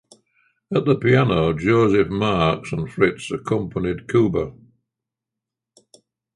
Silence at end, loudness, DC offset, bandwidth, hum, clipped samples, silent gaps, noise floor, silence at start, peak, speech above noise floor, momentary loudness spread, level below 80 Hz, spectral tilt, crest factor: 1.85 s; -20 LUFS; under 0.1%; 11.5 kHz; none; under 0.1%; none; -85 dBFS; 0.7 s; -4 dBFS; 66 dB; 9 LU; -44 dBFS; -7 dB/octave; 18 dB